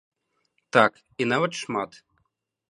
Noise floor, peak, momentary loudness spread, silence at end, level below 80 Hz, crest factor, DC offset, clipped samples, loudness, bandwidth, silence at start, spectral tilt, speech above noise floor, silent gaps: -75 dBFS; -2 dBFS; 10 LU; 0.85 s; -72 dBFS; 26 dB; under 0.1%; under 0.1%; -24 LUFS; 11 kHz; 0.75 s; -4.5 dB/octave; 51 dB; none